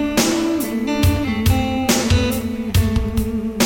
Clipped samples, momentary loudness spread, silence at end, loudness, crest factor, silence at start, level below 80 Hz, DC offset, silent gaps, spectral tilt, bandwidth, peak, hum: under 0.1%; 5 LU; 0 s; -19 LUFS; 14 dB; 0 s; -28 dBFS; under 0.1%; none; -5 dB/octave; 17 kHz; -4 dBFS; none